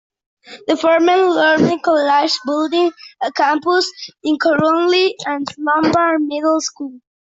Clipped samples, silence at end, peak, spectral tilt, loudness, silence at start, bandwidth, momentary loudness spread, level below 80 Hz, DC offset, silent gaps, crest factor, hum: under 0.1%; 0.25 s; -2 dBFS; -4 dB/octave; -16 LUFS; 0.5 s; 8 kHz; 10 LU; -60 dBFS; under 0.1%; none; 14 dB; none